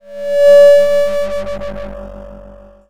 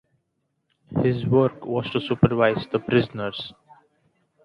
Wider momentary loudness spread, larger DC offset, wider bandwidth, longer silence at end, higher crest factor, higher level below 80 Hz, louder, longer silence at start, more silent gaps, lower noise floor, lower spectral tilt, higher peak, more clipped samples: first, 23 LU vs 11 LU; neither; first, 13.5 kHz vs 5.6 kHz; second, 0 s vs 0.95 s; second, 12 dB vs 22 dB; first, -38 dBFS vs -54 dBFS; first, -10 LUFS vs -23 LUFS; second, 0 s vs 0.9 s; neither; second, -38 dBFS vs -75 dBFS; second, -4 dB/octave vs -9 dB/octave; about the same, 0 dBFS vs -2 dBFS; neither